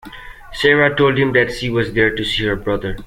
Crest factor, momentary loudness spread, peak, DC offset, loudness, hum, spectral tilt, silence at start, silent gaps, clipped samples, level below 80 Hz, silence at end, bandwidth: 16 dB; 13 LU; 0 dBFS; under 0.1%; -16 LUFS; none; -5.5 dB/octave; 0.05 s; none; under 0.1%; -36 dBFS; 0 s; 15.5 kHz